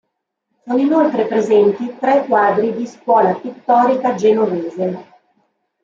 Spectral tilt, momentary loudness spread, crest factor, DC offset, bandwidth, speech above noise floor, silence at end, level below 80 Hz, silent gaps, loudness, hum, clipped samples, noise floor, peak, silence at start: -7 dB/octave; 9 LU; 14 dB; under 0.1%; 7.6 kHz; 58 dB; 0.8 s; -68 dBFS; none; -16 LUFS; none; under 0.1%; -73 dBFS; -2 dBFS; 0.65 s